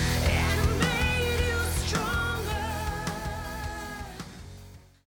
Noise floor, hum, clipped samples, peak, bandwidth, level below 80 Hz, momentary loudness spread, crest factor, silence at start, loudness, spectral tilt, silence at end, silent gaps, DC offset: -49 dBFS; none; under 0.1%; -12 dBFS; 18.5 kHz; -34 dBFS; 16 LU; 16 dB; 0 s; -28 LUFS; -4.5 dB/octave; 0.3 s; none; under 0.1%